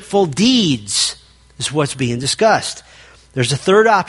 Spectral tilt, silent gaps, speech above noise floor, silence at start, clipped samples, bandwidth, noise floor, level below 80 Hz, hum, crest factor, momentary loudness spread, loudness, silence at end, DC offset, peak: -4 dB/octave; none; 24 dB; 0 s; under 0.1%; 11.5 kHz; -39 dBFS; -50 dBFS; none; 16 dB; 13 LU; -16 LUFS; 0 s; under 0.1%; 0 dBFS